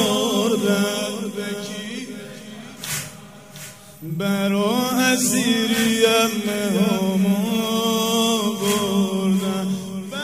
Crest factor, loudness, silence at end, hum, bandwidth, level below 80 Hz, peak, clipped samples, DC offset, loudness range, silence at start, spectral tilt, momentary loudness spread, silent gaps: 18 dB; -20 LUFS; 0 s; none; 16 kHz; -58 dBFS; -4 dBFS; under 0.1%; 0.2%; 9 LU; 0 s; -4 dB/octave; 18 LU; none